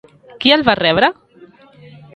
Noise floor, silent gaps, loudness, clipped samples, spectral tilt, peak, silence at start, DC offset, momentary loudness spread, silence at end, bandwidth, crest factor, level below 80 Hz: -45 dBFS; none; -13 LUFS; under 0.1%; -6 dB/octave; 0 dBFS; 0.4 s; under 0.1%; 5 LU; 1.05 s; 9.2 kHz; 18 dB; -50 dBFS